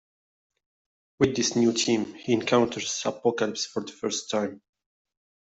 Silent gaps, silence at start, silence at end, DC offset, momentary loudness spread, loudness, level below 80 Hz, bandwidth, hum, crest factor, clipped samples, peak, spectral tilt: none; 1.2 s; 0.85 s; under 0.1%; 8 LU; -26 LUFS; -60 dBFS; 8.2 kHz; none; 20 dB; under 0.1%; -6 dBFS; -3.5 dB/octave